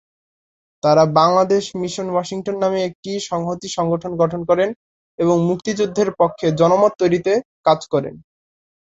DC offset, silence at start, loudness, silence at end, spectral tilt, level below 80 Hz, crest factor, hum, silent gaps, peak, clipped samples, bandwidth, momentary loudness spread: under 0.1%; 0.85 s; -18 LUFS; 0.8 s; -6 dB/octave; -56 dBFS; 18 dB; none; 2.95-3.03 s, 4.76-5.18 s, 7.45-7.64 s; -2 dBFS; under 0.1%; 8.2 kHz; 10 LU